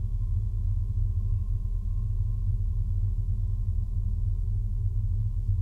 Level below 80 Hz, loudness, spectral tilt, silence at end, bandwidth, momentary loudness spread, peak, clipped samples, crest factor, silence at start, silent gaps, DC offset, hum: -28 dBFS; -31 LUFS; -10.5 dB/octave; 0 s; 1.1 kHz; 2 LU; -16 dBFS; under 0.1%; 10 dB; 0 s; none; under 0.1%; none